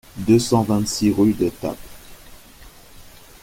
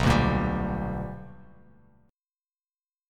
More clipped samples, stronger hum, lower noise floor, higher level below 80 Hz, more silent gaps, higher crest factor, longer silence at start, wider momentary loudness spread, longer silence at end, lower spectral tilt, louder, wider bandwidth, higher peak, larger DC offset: neither; neither; second, -44 dBFS vs under -90 dBFS; second, -46 dBFS vs -38 dBFS; neither; about the same, 18 dB vs 20 dB; first, 0.15 s vs 0 s; second, 14 LU vs 20 LU; second, 0.35 s vs 1.7 s; about the same, -6 dB/octave vs -6.5 dB/octave; first, -19 LUFS vs -28 LUFS; first, 17 kHz vs 14 kHz; first, -4 dBFS vs -10 dBFS; neither